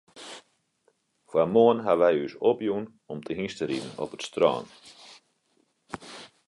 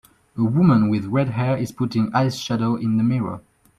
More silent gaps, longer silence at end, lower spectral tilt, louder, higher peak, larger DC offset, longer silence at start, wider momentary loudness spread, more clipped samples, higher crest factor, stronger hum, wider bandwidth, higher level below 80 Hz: neither; second, 0.2 s vs 0.4 s; second, -5.5 dB/octave vs -7.5 dB/octave; second, -26 LUFS vs -21 LUFS; second, -8 dBFS vs -4 dBFS; neither; second, 0.15 s vs 0.35 s; first, 23 LU vs 9 LU; neither; about the same, 20 dB vs 16 dB; neither; second, 11.5 kHz vs 14 kHz; second, -66 dBFS vs -54 dBFS